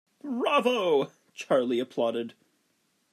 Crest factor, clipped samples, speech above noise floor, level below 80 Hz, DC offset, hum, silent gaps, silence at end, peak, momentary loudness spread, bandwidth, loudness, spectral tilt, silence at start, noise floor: 18 dB; under 0.1%; 46 dB; -86 dBFS; under 0.1%; none; none; 0.8 s; -12 dBFS; 12 LU; 13.5 kHz; -27 LUFS; -4.5 dB/octave; 0.25 s; -72 dBFS